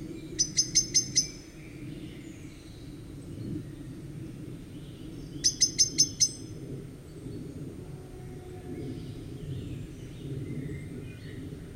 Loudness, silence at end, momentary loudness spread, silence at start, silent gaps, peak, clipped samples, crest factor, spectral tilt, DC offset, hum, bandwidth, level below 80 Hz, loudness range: -28 LUFS; 0 s; 21 LU; 0 s; none; -8 dBFS; under 0.1%; 24 dB; -2 dB/octave; under 0.1%; none; 16 kHz; -52 dBFS; 14 LU